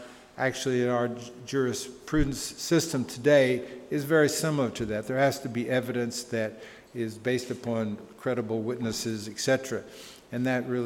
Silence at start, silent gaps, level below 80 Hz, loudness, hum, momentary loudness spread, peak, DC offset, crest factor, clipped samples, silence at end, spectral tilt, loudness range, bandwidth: 0 s; none; -48 dBFS; -28 LUFS; none; 12 LU; -8 dBFS; under 0.1%; 20 dB; under 0.1%; 0 s; -5 dB/octave; 6 LU; 18 kHz